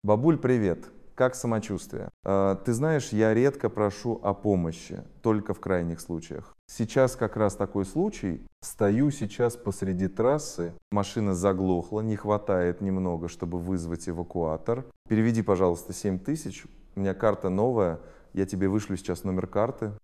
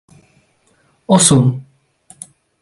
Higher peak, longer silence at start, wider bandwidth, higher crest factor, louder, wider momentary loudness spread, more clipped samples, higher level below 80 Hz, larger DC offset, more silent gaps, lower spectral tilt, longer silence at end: second, -8 dBFS vs 0 dBFS; second, 0.05 s vs 1.1 s; first, 14.5 kHz vs 12 kHz; about the same, 20 dB vs 18 dB; second, -28 LUFS vs -12 LUFS; second, 11 LU vs 27 LU; neither; about the same, -48 dBFS vs -50 dBFS; neither; first, 2.13-2.23 s, 6.59-6.68 s, 8.52-8.62 s, 10.82-10.91 s, 14.96-15.05 s vs none; first, -7 dB/octave vs -4.5 dB/octave; second, 0.05 s vs 1 s